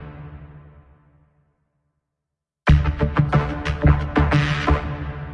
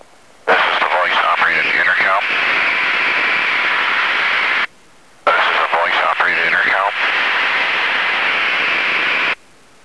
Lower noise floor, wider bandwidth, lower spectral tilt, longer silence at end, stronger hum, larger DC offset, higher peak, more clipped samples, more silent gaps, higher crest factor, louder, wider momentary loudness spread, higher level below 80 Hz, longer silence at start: first, -83 dBFS vs -48 dBFS; second, 7.6 kHz vs 11 kHz; first, -7.5 dB/octave vs -1.5 dB/octave; second, 0 s vs 0.5 s; neither; second, under 0.1% vs 0.4%; about the same, -4 dBFS vs -2 dBFS; neither; neither; about the same, 18 dB vs 14 dB; second, -20 LUFS vs -14 LUFS; first, 20 LU vs 3 LU; first, -28 dBFS vs -62 dBFS; second, 0 s vs 0.45 s